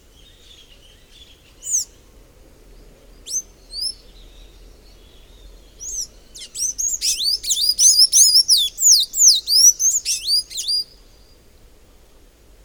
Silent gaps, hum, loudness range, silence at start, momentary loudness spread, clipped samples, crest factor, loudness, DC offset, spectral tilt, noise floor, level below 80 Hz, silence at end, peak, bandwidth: none; none; 20 LU; 1.65 s; 20 LU; under 0.1%; 20 dB; -14 LUFS; under 0.1%; 3.5 dB/octave; -49 dBFS; -48 dBFS; 1.8 s; 0 dBFS; over 20 kHz